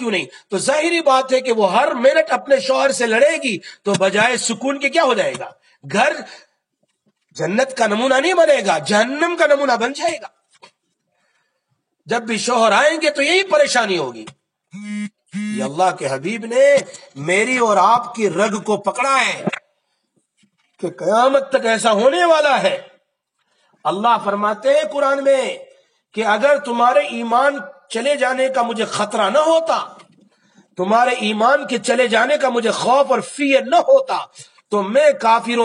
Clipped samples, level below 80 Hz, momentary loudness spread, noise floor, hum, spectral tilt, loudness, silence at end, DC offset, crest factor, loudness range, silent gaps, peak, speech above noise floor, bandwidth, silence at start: under 0.1%; -80 dBFS; 12 LU; -70 dBFS; none; -3.5 dB/octave; -16 LUFS; 0 s; under 0.1%; 16 dB; 4 LU; none; -2 dBFS; 54 dB; 11.5 kHz; 0 s